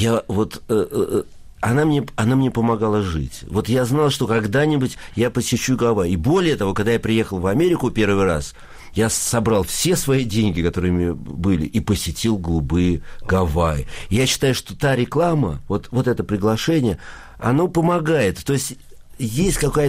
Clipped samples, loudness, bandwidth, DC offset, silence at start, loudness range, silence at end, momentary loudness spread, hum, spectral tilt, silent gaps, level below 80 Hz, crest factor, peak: under 0.1%; -20 LUFS; 15.5 kHz; under 0.1%; 0 s; 2 LU; 0 s; 7 LU; none; -5.5 dB/octave; none; -36 dBFS; 12 dB; -8 dBFS